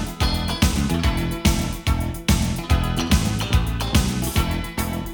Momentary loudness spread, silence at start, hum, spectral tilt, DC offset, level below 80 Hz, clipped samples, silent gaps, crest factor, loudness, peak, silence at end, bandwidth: 4 LU; 0 s; none; -4.5 dB/octave; under 0.1%; -26 dBFS; under 0.1%; none; 18 dB; -22 LUFS; -4 dBFS; 0 s; over 20 kHz